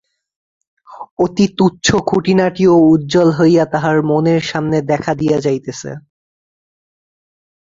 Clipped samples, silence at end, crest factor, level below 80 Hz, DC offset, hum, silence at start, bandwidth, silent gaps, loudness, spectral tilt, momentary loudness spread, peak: under 0.1%; 1.8 s; 14 dB; -48 dBFS; under 0.1%; none; 0.9 s; 7.8 kHz; 1.11-1.17 s; -14 LUFS; -6 dB/octave; 11 LU; 0 dBFS